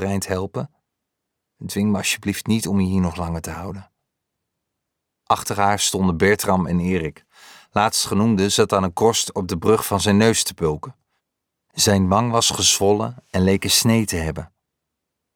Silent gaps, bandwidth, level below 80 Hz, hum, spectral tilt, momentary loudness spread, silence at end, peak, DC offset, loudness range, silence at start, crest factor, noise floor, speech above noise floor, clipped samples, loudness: none; 19.5 kHz; -46 dBFS; none; -4 dB/octave; 14 LU; 0.9 s; -2 dBFS; under 0.1%; 6 LU; 0 s; 18 dB; -80 dBFS; 61 dB; under 0.1%; -19 LUFS